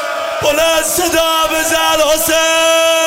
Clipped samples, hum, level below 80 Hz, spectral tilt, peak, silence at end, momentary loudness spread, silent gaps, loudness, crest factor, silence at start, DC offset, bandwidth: under 0.1%; none; -38 dBFS; -1 dB/octave; 0 dBFS; 0 s; 3 LU; none; -12 LUFS; 12 dB; 0 s; under 0.1%; 16.5 kHz